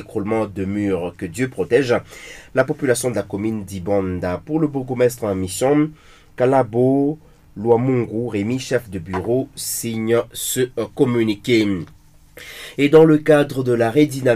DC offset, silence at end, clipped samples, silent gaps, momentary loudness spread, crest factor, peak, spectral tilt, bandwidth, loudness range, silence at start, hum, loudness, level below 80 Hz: under 0.1%; 0 s; under 0.1%; none; 9 LU; 16 dB; -2 dBFS; -5.5 dB/octave; 15.5 kHz; 4 LU; 0 s; none; -19 LUFS; -50 dBFS